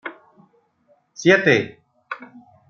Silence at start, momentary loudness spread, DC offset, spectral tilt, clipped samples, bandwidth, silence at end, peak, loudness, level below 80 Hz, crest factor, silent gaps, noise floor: 0.05 s; 20 LU; under 0.1%; -5 dB/octave; under 0.1%; 7.4 kHz; 0.45 s; -2 dBFS; -17 LUFS; -64 dBFS; 22 dB; none; -62 dBFS